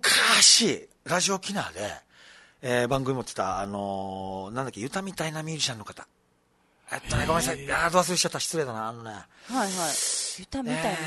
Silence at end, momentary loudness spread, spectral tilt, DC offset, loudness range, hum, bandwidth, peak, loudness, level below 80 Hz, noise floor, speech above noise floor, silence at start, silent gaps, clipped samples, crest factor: 0 s; 17 LU; -2 dB/octave; under 0.1%; 9 LU; none; 12.5 kHz; -4 dBFS; -25 LUFS; -50 dBFS; -67 dBFS; 40 dB; 0.05 s; none; under 0.1%; 22 dB